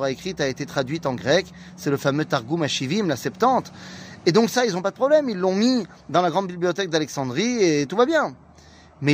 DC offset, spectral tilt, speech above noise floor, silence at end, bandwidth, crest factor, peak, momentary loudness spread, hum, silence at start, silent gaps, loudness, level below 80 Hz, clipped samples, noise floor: under 0.1%; -5 dB/octave; 27 dB; 0 s; 15.5 kHz; 18 dB; -4 dBFS; 7 LU; none; 0 s; none; -22 LUFS; -58 dBFS; under 0.1%; -49 dBFS